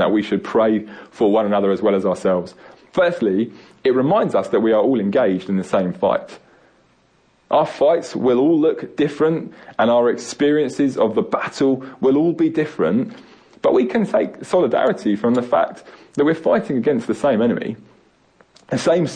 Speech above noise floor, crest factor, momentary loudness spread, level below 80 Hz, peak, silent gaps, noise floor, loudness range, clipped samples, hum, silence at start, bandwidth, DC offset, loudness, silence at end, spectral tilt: 40 dB; 12 dB; 7 LU; -60 dBFS; -6 dBFS; none; -58 dBFS; 2 LU; under 0.1%; none; 0 s; 10 kHz; under 0.1%; -18 LUFS; 0 s; -6.5 dB/octave